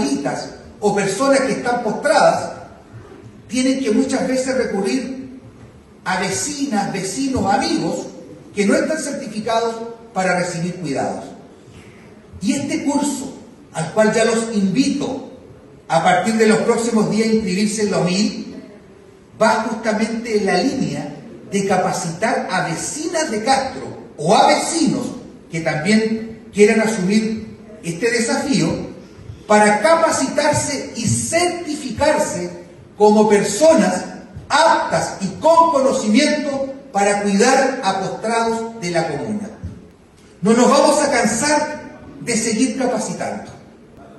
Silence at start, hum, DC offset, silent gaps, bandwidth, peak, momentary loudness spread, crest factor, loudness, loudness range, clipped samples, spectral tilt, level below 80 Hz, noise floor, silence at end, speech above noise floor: 0 s; none; under 0.1%; none; 13 kHz; 0 dBFS; 16 LU; 18 dB; -18 LUFS; 5 LU; under 0.1%; -4.5 dB/octave; -52 dBFS; -46 dBFS; 0 s; 29 dB